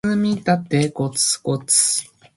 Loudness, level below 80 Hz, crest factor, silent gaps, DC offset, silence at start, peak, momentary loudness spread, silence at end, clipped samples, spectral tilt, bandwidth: -18 LUFS; -58 dBFS; 18 dB; none; under 0.1%; 0.05 s; -2 dBFS; 7 LU; 0.35 s; under 0.1%; -3.5 dB/octave; 12 kHz